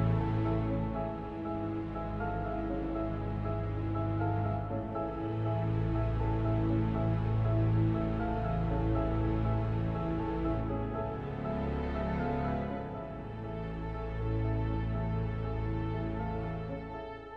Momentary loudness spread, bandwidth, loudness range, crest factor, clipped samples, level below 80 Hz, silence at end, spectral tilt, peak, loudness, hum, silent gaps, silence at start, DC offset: 8 LU; 4.7 kHz; 5 LU; 14 dB; under 0.1%; -40 dBFS; 0 s; -10.5 dB/octave; -20 dBFS; -34 LUFS; none; none; 0 s; under 0.1%